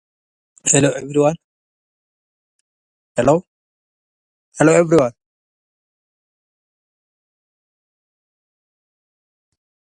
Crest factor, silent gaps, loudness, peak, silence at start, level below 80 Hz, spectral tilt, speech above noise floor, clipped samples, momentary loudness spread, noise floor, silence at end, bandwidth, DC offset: 22 dB; 1.44-3.15 s, 3.47-4.52 s; -16 LUFS; 0 dBFS; 0.65 s; -56 dBFS; -5 dB/octave; over 76 dB; under 0.1%; 10 LU; under -90 dBFS; 4.9 s; 11.5 kHz; under 0.1%